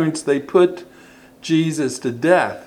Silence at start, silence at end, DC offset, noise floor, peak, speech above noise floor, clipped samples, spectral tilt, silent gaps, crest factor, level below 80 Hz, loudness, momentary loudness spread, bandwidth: 0 s; 0 s; under 0.1%; -46 dBFS; 0 dBFS; 28 dB; under 0.1%; -5.5 dB/octave; none; 18 dB; -64 dBFS; -18 LUFS; 8 LU; 13.5 kHz